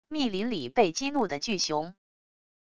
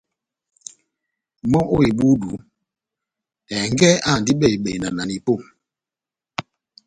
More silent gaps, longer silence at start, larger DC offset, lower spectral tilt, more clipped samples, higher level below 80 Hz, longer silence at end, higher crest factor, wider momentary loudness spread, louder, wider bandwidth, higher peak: neither; second, 0 s vs 1.45 s; neither; second, -3.5 dB/octave vs -5 dB/octave; neither; second, -62 dBFS vs -46 dBFS; first, 0.7 s vs 0.45 s; about the same, 20 dB vs 20 dB; second, 6 LU vs 19 LU; second, -28 LUFS vs -19 LUFS; about the same, 11 kHz vs 11 kHz; second, -10 dBFS vs -2 dBFS